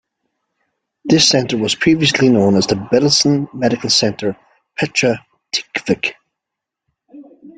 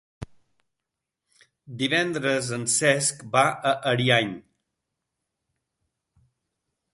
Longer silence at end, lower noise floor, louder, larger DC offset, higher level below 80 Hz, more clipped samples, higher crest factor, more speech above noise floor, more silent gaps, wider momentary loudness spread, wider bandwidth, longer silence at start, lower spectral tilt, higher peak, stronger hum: second, 0.1 s vs 2.55 s; about the same, -82 dBFS vs -85 dBFS; first, -15 LUFS vs -23 LUFS; neither; first, -52 dBFS vs -62 dBFS; neither; second, 16 dB vs 24 dB; first, 68 dB vs 62 dB; neither; second, 11 LU vs 22 LU; second, 9.4 kHz vs 11.5 kHz; first, 1.05 s vs 0.2 s; about the same, -4 dB/octave vs -3 dB/octave; first, 0 dBFS vs -4 dBFS; neither